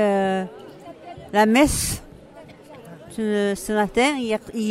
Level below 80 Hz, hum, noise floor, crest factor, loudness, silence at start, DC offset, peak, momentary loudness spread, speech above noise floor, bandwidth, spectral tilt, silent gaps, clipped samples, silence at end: -42 dBFS; none; -44 dBFS; 18 dB; -21 LUFS; 0 s; under 0.1%; -4 dBFS; 24 LU; 24 dB; 16 kHz; -4 dB/octave; none; under 0.1%; 0 s